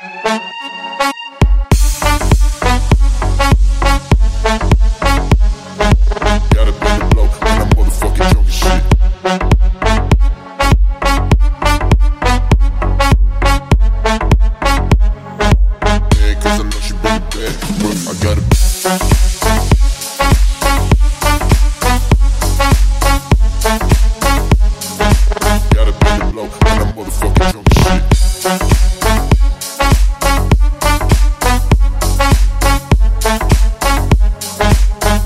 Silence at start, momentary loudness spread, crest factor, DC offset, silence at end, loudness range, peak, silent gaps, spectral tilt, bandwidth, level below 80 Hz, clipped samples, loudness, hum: 0 s; 4 LU; 10 dB; under 0.1%; 0 s; 1 LU; 0 dBFS; none; -5 dB/octave; 15.5 kHz; -12 dBFS; under 0.1%; -13 LUFS; none